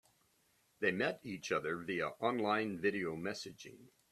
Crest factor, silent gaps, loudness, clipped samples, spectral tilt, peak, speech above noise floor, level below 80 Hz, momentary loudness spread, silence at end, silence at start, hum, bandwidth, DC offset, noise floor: 20 dB; none; -37 LUFS; under 0.1%; -5 dB/octave; -18 dBFS; 37 dB; -76 dBFS; 11 LU; 0.25 s; 0.8 s; none; 14 kHz; under 0.1%; -75 dBFS